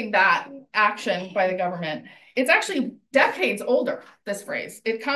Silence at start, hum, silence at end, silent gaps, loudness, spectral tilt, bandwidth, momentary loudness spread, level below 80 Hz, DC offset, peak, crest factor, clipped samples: 0 s; none; 0 s; none; -23 LUFS; -3.5 dB/octave; 13 kHz; 12 LU; -76 dBFS; under 0.1%; -4 dBFS; 20 dB; under 0.1%